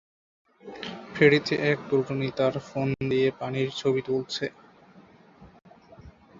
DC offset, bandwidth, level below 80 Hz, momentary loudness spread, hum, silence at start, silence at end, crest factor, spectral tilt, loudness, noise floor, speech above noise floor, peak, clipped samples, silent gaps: under 0.1%; 7.6 kHz; -60 dBFS; 16 LU; none; 0.65 s; 0.3 s; 24 dB; -6 dB/octave; -26 LUFS; -54 dBFS; 29 dB; -4 dBFS; under 0.1%; none